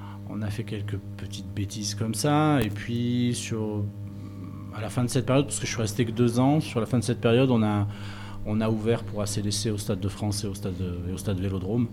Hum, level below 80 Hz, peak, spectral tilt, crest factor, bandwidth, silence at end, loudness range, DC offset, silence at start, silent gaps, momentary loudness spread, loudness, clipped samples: 50 Hz at -40 dBFS; -48 dBFS; -10 dBFS; -6 dB/octave; 16 dB; 17.5 kHz; 0 s; 4 LU; under 0.1%; 0 s; none; 13 LU; -27 LUFS; under 0.1%